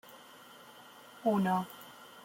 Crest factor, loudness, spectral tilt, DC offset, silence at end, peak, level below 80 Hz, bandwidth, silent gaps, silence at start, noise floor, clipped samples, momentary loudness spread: 18 dB; -33 LUFS; -6.5 dB/octave; under 0.1%; 0.05 s; -18 dBFS; -78 dBFS; 16.5 kHz; none; 0.1 s; -55 dBFS; under 0.1%; 22 LU